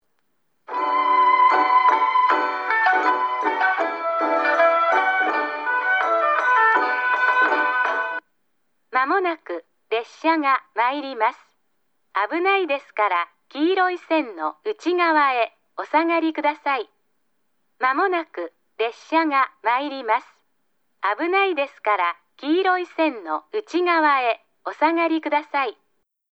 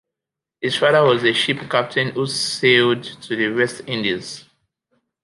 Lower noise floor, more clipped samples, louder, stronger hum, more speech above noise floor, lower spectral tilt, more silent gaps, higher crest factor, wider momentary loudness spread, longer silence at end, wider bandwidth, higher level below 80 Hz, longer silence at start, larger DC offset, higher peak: second, -72 dBFS vs -86 dBFS; neither; second, -21 LUFS vs -18 LUFS; neither; second, 51 dB vs 67 dB; second, -2.5 dB/octave vs -4 dB/octave; neither; about the same, 16 dB vs 18 dB; second, 10 LU vs 13 LU; second, 0.6 s vs 0.85 s; second, 8 kHz vs 11.5 kHz; second, -86 dBFS vs -64 dBFS; about the same, 0.7 s vs 0.6 s; neither; second, -6 dBFS vs -2 dBFS